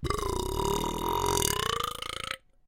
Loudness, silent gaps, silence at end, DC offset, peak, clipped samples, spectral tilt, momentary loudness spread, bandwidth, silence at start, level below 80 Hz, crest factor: -30 LUFS; none; 0.3 s; under 0.1%; -8 dBFS; under 0.1%; -3 dB/octave; 9 LU; 17 kHz; 0 s; -40 dBFS; 22 dB